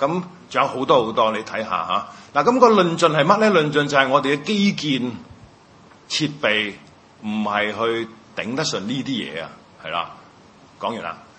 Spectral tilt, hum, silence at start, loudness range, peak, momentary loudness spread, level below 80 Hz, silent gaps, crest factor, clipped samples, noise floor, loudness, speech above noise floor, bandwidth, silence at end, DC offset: -4.5 dB/octave; none; 0 s; 8 LU; 0 dBFS; 14 LU; -62 dBFS; none; 20 dB; under 0.1%; -48 dBFS; -20 LUFS; 29 dB; 8.8 kHz; 0.2 s; under 0.1%